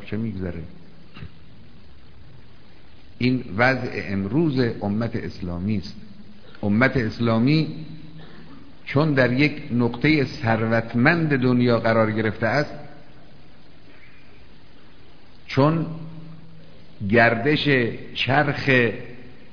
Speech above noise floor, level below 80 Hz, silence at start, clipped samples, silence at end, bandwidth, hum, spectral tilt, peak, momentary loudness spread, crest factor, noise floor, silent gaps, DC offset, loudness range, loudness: 29 dB; -50 dBFS; 0 s; under 0.1%; 0.2 s; 5.4 kHz; none; -8 dB/octave; -2 dBFS; 20 LU; 22 dB; -50 dBFS; none; 1%; 8 LU; -21 LUFS